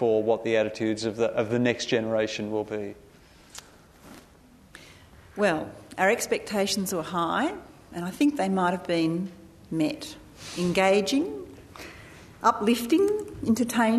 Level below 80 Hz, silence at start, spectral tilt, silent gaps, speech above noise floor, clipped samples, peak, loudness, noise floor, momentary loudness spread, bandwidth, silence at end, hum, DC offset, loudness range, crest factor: -58 dBFS; 0 s; -5 dB/octave; none; 29 dB; under 0.1%; -8 dBFS; -26 LUFS; -54 dBFS; 19 LU; 13.5 kHz; 0 s; none; under 0.1%; 7 LU; 20 dB